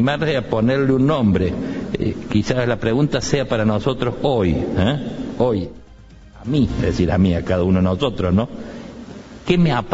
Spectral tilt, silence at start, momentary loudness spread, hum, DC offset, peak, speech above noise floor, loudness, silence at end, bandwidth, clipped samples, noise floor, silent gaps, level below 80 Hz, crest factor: -7 dB/octave; 0 s; 11 LU; none; under 0.1%; -2 dBFS; 24 dB; -19 LUFS; 0 s; 8 kHz; under 0.1%; -42 dBFS; none; -36 dBFS; 18 dB